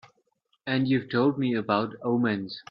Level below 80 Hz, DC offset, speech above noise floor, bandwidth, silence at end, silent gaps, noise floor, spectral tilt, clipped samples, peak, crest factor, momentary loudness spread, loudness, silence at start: -68 dBFS; under 0.1%; 46 dB; 5.4 kHz; 0.1 s; none; -72 dBFS; -8.5 dB/octave; under 0.1%; -10 dBFS; 18 dB; 6 LU; -26 LUFS; 0.65 s